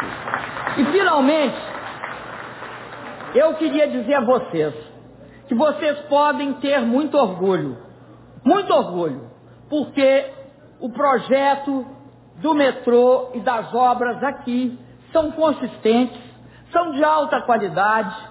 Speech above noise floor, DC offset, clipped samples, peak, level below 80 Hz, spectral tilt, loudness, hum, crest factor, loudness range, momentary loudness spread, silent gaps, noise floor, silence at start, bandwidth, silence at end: 25 dB; under 0.1%; under 0.1%; -4 dBFS; -58 dBFS; -9.5 dB/octave; -19 LUFS; none; 16 dB; 2 LU; 15 LU; none; -44 dBFS; 0 s; 4 kHz; 0 s